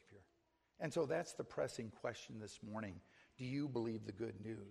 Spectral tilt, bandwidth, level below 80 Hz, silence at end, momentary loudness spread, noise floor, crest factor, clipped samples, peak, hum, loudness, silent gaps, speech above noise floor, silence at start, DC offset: -6 dB/octave; 13 kHz; -76 dBFS; 0 s; 10 LU; -80 dBFS; 18 dB; under 0.1%; -28 dBFS; none; -45 LUFS; none; 35 dB; 0.1 s; under 0.1%